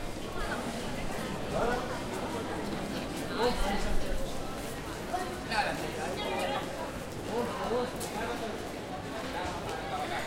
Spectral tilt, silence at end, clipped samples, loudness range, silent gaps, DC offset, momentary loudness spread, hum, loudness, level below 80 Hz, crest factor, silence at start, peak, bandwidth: -4.5 dB/octave; 0 s; under 0.1%; 1 LU; none; under 0.1%; 7 LU; none; -35 LUFS; -42 dBFS; 18 dB; 0 s; -16 dBFS; 16.5 kHz